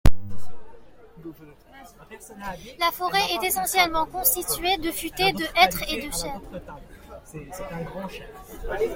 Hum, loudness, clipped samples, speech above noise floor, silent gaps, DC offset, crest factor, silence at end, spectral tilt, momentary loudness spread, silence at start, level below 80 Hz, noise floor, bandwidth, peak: none; -24 LUFS; under 0.1%; 21 dB; none; under 0.1%; 22 dB; 0 s; -3 dB/octave; 23 LU; 0.05 s; -36 dBFS; -47 dBFS; 17 kHz; -2 dBFS